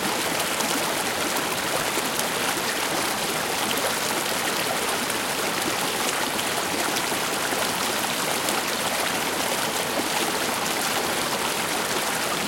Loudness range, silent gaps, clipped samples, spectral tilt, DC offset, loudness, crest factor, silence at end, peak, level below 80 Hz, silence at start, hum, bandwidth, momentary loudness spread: 0 LU; none; under 0.1%; -1.5 dB/octave; under 0.1%; -24 LUFS; 22 dB; 0 s; -4 dBFS; -58 dBFS; 0 s; none; 17 kHz; 1 LU